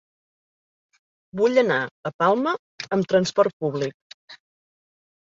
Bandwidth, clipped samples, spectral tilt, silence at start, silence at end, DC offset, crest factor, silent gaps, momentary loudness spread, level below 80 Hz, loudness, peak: 7.8 kHz; under 0.1%; -5.5 dB/octave; 1.35 s; 0.95 s; under 0.1%; 20 dB; 1.91-2.03 s, 2.14-2.19 s, 2.59-2.78 s, 3.53-3.60 s, 3.94-4.28 s; 11 LU; -68 dBFS; -22 LUFS; -4 dBFS